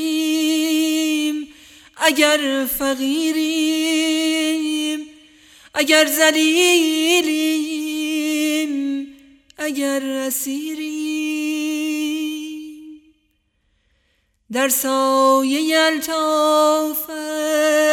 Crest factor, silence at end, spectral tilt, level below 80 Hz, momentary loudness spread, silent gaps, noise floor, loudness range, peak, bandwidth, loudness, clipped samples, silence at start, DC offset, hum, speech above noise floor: 18 dB; 0 s; -0.5 dB/octave; -60 dBFS; 11 LU; none; -66 dBFS; 8 LU; 0 dBFS; 18 kHz; -18 LUFS; under 0.1%; 0 s; under 0.1%; none; 49 dB